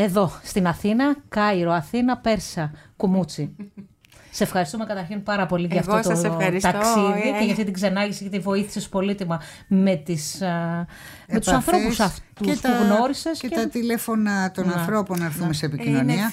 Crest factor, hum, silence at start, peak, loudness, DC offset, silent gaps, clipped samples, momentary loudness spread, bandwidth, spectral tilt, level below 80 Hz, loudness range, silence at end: 16 dB; none; 0 s; -6 dBFS; -23 LUFS; under 0.1%; none; under 0.1%; 9 LU; 16 kHz; -5.5 dB/octave; -48 dBFS; 3 LU; 0 s